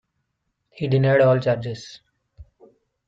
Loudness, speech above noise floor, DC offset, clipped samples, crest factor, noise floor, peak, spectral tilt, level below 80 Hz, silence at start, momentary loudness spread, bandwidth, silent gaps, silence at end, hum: -20 LUFS; 56 dB; under 0.1%; under 0.1%; 18 dB; -76 dBFS; -6 dBFS; -7.5 dB/octave; -58 dBFS; 0.75 s; 19 LU; 7.6 kHz; none; 0.65 s; none